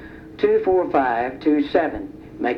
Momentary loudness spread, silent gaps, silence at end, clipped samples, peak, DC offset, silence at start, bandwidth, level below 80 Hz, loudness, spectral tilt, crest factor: 14 LU; none; 0 s; under 0.1%; -6 dBFS; under 0.1%; 0 s; 5.8 kHz; -48 dBFS; -20 LUFS; -7.5 dB/octave; 14 dB